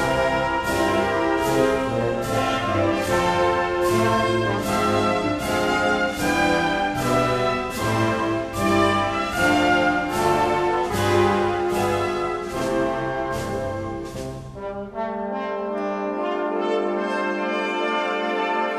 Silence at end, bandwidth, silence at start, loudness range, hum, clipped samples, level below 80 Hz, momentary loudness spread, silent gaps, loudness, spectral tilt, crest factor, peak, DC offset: 0 s; 14 kHz; 0 s; 6 LU; none; under 0.1%; -44 dBFS; 8 LU; none; -22 LUFS; -5 dB/octave; 16 dB; -6 dBFS; under 0.1%